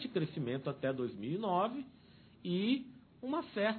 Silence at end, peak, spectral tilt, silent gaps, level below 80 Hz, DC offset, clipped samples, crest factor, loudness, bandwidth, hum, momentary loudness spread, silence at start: 0 s; -20 dBFS; -5 dB/octave; none; -76 dBFS; under 0.1%; under 0.1%; 18 dB; -37 LUFS; 4.5 kHz; none; 13 LU; 0 s